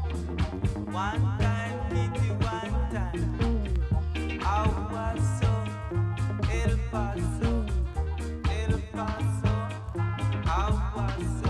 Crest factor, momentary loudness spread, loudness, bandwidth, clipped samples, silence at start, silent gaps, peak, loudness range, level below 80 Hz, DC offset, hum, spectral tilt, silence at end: 14 dB; 4 LU; -29 LUFS; 11.5 kHz; under 0.1%; 0 s; none; -12 dBFS; 1 LU; -32 dBFS; under 0.1%; none; -7 dB/octave; 0 s